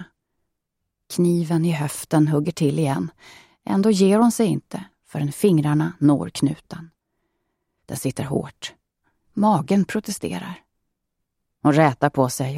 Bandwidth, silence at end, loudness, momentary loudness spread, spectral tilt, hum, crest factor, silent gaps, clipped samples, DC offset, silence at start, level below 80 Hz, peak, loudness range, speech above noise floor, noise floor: 16 kHz; 0 s; -21 LUFS; 17 LU; -6.5 dB/octave; none; 18 dB; none; under 0.1%; under 0.1%; 0 s; -60 dBFS; -4 dBFS; 5 LU; 59 dB; -79 dBFS